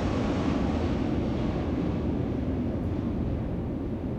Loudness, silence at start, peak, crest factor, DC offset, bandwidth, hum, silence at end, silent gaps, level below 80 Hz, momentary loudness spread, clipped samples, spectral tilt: -29 LUFS; 0 s; -16 dBFS; 12 dB; under 0.1%; 8.4 kHz; none; 0 s; none; -38 dBFS; 4 LU; under 0.1%; -8.5 dB/octave